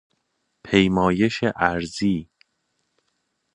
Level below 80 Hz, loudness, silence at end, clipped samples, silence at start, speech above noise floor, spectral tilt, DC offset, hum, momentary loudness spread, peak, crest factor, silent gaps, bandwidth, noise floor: -48 dBFS; -21 LUFS; 1.3 s; under 0.1%; 0.65 s; 53 dB; -6 dB/octave; under 0.1%; none; 6 LU; -2 dBFS; 22 dB; none; 10.5 kHz; -73 dBFS